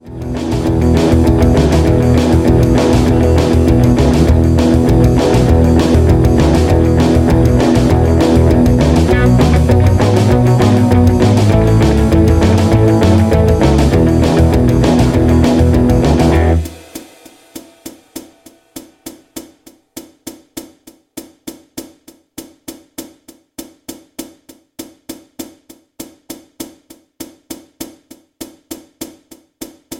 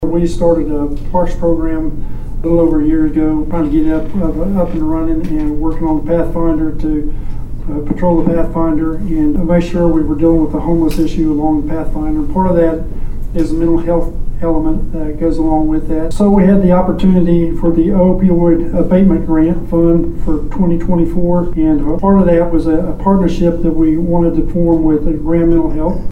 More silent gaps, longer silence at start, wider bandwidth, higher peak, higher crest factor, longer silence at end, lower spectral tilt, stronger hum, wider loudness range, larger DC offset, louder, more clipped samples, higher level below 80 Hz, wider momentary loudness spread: neither; about the same, 0.05 s vs 0 s; first, 16.5 kHz vs 8.6 kHz; about the same, 0 dBFS vs 0 dBFS; about the same, 12 dB vs 10 dB; about the same, 0 s vs 0 s; second, -7.5 dB/octave vs -9.5 dB/octave; neither; first, 23 LU vs 5 LU; neither; first, -10 LUFS vs -14 LUFS; neither; about the same, -20 dBFS vs -18 dBFS; first, 22 LU vs 8 LU